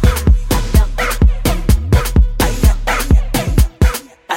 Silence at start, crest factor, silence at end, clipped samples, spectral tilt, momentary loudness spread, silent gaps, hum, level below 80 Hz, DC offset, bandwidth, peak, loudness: 0 s; 12 dB; 0 s; under 0.1%; -5.5 dB/octave; 3 LU; none; none; -14 dBFS; under 0.1%; 17 kHz; 0 dBFS; -15 LUFS